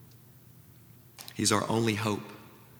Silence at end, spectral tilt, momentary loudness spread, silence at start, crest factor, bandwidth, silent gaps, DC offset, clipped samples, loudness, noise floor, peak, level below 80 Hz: 0.25 s; -4 dB/octave; 20 LU; 1.2 s; 24 dB; over 20 kHz; none; under 0.1%; under 0.1%; -29 LUFS; -55 dBFS; -10 dBFS; -70 dBFS